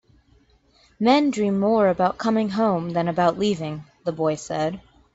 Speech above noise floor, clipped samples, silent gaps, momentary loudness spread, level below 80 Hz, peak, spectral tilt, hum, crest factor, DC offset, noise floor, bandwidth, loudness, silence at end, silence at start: 37 dB; under 0.1%; none; 10 LU; -58 dBFS; -6 dBFS; -6 dB/octave; none; 18 dB; under 0.1%; -58 dBFS; 8 kHz; -22 LUFS; 0.35 s; 1 s